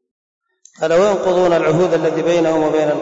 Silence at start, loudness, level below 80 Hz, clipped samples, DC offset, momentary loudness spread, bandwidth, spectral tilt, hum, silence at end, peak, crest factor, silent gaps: 0.8 s; -15 LUFS; -50 dBFS; under 0.1%; 0.2%; 2 LU; 8 kHz; -6 dB/octave; none; 0 s; -6 dBFS; 10 dB; none